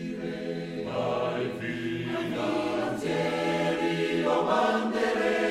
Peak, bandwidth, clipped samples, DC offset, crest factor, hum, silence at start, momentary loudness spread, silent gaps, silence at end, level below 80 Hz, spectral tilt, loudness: -12 dBFS; 14 kHz; under 0.1%; under 0.1%; 16 dB; none; 0 s; 9 LU; none; 0 s; -60 dBFS; -5.5 dB/octave; -28 LUFS